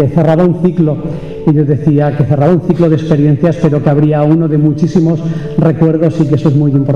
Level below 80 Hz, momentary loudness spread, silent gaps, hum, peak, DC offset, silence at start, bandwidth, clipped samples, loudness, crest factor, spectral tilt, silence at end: -38 dBFS; 4 LU; none; none; 0 dBFS; 1%; 0 s; 6.8 kHz; under 0.1%; -11 LUFS; 8 dB; -10 dB/octave; 0 s